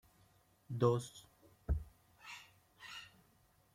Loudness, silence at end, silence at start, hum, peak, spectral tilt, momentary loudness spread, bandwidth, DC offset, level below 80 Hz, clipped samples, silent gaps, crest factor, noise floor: -39 LUFS; 0.7 s; 0.7 s; none; -20 dBFS; -6.5 dB/octave; 24 LU; 16 kHz; under 0.1%; -52 dBFS; under 0.1%; none; 24 dB; -71 dBFS